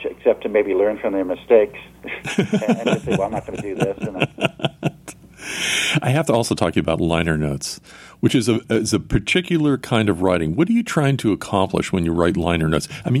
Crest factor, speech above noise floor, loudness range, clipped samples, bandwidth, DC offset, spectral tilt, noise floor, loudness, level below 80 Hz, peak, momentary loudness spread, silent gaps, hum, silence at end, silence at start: 18 dB; 22 dB; 3 LU; under 0.1%; 15 kHz; under 0.1%; -5.5 dB/octave; -41 dBFS; -20 LUFS; -42 dBFS; -2 dBFS; 9 LU; none; none; 0 s; 0 s